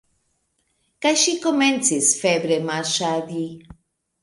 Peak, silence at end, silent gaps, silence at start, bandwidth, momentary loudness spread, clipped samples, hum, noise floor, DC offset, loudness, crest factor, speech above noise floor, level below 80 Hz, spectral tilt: -4 dBFS; 0.5 s; none; 1 s; 11.5 kHz; 9 LU; under 0.1%; none; -70 dBFS; under 0.1%; -20 LUFS; 18 dB; 49 dB; -62 dBFS; -2.5 dB/octave